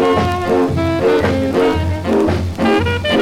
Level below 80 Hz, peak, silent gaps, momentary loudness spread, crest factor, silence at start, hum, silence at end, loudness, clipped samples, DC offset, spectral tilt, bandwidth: -32 dBFS; -2 dBFS; none; 3 LU; 12 dB; 0 s; none; 0 s; -15 LUFS; under 0.1%; under 0.1%; -6.5 dB/octave; 15.5 kHz